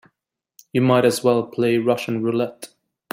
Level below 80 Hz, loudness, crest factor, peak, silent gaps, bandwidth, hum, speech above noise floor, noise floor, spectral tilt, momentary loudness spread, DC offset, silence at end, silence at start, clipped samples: -64 dBFS; -20 LUFS; 16 dB; -4 dBFS; none; 16 kHz; none; 58 dB; -77 dBFS; -6 dB/octave; 11 LU; under 0.1%; 0.45 s; 0.75 s; under 0.1%